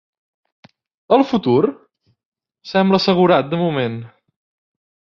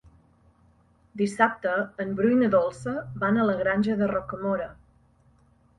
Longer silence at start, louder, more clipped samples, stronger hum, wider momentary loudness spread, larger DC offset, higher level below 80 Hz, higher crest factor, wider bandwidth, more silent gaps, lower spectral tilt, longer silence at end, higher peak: about the same, 1.1 s vs 1.15 s; first, -16 LUFS vs -25 LUFS; neither; neither; about the same, 8 LU vs 9 LU; neither; about the same, -60 dBFS vs -58 dBFS; about the same, 18 dB vs 20 dB; second, 7 kHz vs 11.5 kHz; first, 2.25-2.32 s vs none; about the same, -7.5 dB/octave vs -7 dB/octave; about the same, 0.95 s vs 1.05 s; first, -2 dBFS vs -6 dBFS